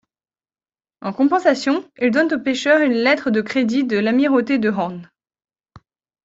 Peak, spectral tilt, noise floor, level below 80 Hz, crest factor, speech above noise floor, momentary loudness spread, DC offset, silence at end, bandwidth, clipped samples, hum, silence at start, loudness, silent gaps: -4 dBFS; -5.5 dB/octave; under -90 dBFS; -62 dBFS; 16 dB; over 73 dB; 8 LU; under 0.1%; 0.45 s; 7.8 kHz; under 0.1%; none; 1.05 s; -18 LUFS; none